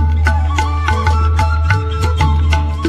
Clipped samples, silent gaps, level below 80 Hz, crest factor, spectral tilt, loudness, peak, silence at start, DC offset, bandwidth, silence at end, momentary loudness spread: under 0.1%; none; -16 dBFS; 12 dB; -6 dB/octave; -15 LUFS; 0 dBFS; 0 s; under 0.1%; 9.4 kHz; 0 s; 2 LU